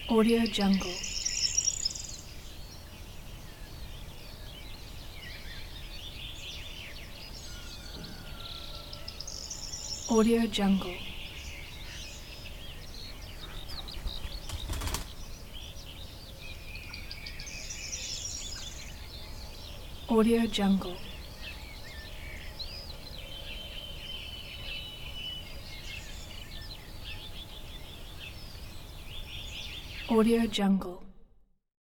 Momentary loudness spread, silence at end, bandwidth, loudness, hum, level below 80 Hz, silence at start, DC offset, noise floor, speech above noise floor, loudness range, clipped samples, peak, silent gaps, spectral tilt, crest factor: 19 LU; 0.6 s; 19 kHz; -34 LUFS; none; -44 dBFS; 0 s; under 0.1%; -58 dBFS; 32 dB; 12 LU; under 0.1%; -12 dBFS; none; -4 dB/octave; 22 dB